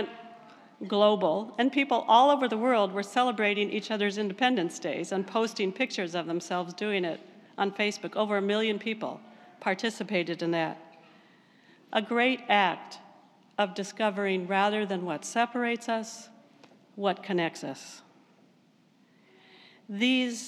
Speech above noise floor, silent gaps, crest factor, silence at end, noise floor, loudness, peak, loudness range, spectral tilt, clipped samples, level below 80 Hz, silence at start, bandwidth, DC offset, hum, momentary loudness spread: 35 dB; none; 22 dB; 0 s; -63 dBFS; -28 LUFS; -8 dBFS; 8 LU; -4.5 dB/octave; under 0.1%; under -90 dBFS; 0 s; 13 kHz; under 0.1%; none; 15 LU